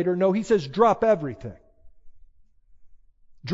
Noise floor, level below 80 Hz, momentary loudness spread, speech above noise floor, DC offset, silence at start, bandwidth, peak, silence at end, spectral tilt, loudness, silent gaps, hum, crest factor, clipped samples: -53 dBFS; -54 dBFS; 21 LU; 31 dB; under 0.1%; 0 s; 7.8 kHz; -6 dBFS; 0 s; -7 dB/octave; -22 LUFS; none; none; 20 dB; under 0.1%